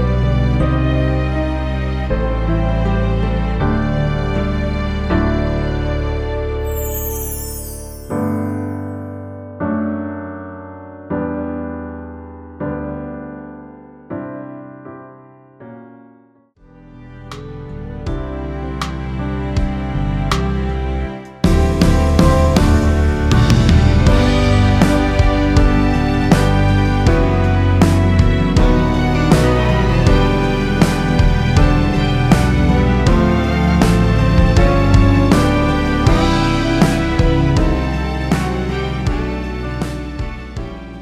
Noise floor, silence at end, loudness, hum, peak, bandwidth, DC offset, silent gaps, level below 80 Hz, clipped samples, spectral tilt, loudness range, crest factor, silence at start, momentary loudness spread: -50 dBFS; 0 s; -16 LUFS; none; 0 dBFS; 16 kHz; under 0.1%; none; -20 dBFS; under 0.1%; -7 dB/octave; 16 LU; 14 dB; 0 s; 16 LU